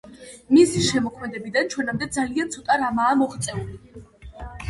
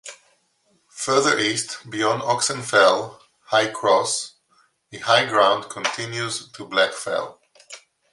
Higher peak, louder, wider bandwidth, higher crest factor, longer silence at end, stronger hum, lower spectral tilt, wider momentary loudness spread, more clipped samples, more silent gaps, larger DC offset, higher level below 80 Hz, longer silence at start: about the same, -4 dBFS vs -2 dBFS; about the same, -22 LUFS vs -21 LUFS; about the same, 11.5 kHz vs 11.5 kHz; about the same, 18 dB vs 20 dB; second, 0 s vs 0.35 s; neither; first, -4.5 dB/octave vs -2.5 dB/octave; first, 22 LU vs 19 LU; neither; neither; neither; first, -48 dBFS vs -68 dBFS; about the same, 0.05 s vs 0.05 s